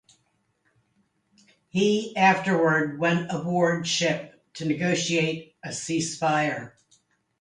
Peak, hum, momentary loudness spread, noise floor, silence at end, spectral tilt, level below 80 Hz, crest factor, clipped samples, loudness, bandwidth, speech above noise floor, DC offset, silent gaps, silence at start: -6 dBFS; none; 13 LU; -71 dBFS; 0.7 s; -4.5 dB/octave; -68 dBFS; 20 dB; under 0.1%; -24 LUFS; 11 kHz; 47 dB; under 0.1%; none; 1.75 s